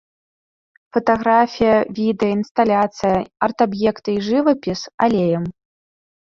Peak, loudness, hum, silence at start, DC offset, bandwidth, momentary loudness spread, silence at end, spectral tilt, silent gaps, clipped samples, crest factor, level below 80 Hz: -2 dBFS; -18 LUFS; none; 0.95 s; under 0.1%; 7.4 kHz; 7 LU; 0.7 s; -6.5 dB/octave; 2.51-2.55 s, 4.94-4.98 s; under 0.1%; 18 dB; -52 dBFS